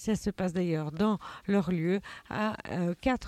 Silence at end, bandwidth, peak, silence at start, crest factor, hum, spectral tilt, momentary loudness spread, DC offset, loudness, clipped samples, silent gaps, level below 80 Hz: 0 s; 13.5 kHz; -14 dBFS; 0 s; 16 dB; none; -7 dB/octave; 4 LU; under 0.1%; -31 LUFS; under 0.1%; none; -52 dBFS